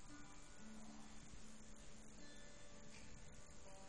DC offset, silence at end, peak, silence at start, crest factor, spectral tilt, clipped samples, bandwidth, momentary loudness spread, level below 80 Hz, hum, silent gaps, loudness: 0.2%; 0 s; -44 dBFS; 0 s; 14 dB; -3.5 dB/octave; under 0.1%; 10.5 kHz; 2 LU; -66 dBFS; none; none; -61 LUFS